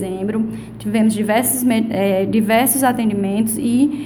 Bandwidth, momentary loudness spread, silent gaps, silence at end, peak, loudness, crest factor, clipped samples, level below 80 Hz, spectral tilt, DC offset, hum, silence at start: over 20 kHz; 7 LU; none; 0 s; -4 dBFS; -17 LUFS; 14 dB; under 0.1%; -50 dBFS; -4.5 dB/octave; under 0.1%; none; 0 s